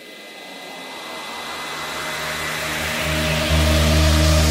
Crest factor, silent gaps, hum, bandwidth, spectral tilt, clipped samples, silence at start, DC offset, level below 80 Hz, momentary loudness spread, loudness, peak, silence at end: 16 dB; none; none; 16.5 kHz; -4 dB/octave; under 0.1%; 0 s; under 0.1%; -26 dBFS; 18 LU; -20 LUFS; -4 dBFS; 0 s